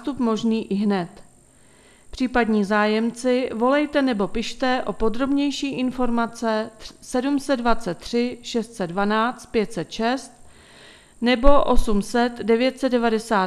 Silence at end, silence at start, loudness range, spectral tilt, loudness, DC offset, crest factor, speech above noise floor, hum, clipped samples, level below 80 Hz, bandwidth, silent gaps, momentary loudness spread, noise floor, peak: 0 s; 0 s; 3 LU; -5 dB/octave; -22 LUFS; under 0.1%; 22 dB; 32 dB; none; under 0.1%; -36 dBFS; 12.5 kHz; none; 8 LU; -52 dBFS; 0 dBFS